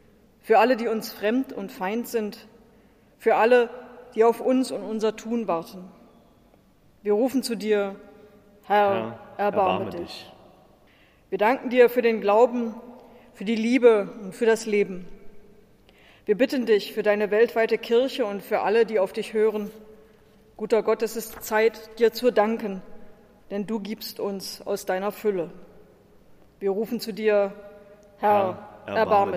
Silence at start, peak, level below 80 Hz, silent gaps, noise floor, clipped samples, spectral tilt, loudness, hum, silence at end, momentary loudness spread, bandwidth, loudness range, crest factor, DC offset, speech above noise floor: 0.45 s; -4 dBFS; -62 dBFS; none; -57 dBFS; under 0.1%; -5 dB/octave; -24 LUFS; none; 0 s; 15 LU; 15.5 kHz; 6 LU; 20 dB; under 0.1%; 34 dB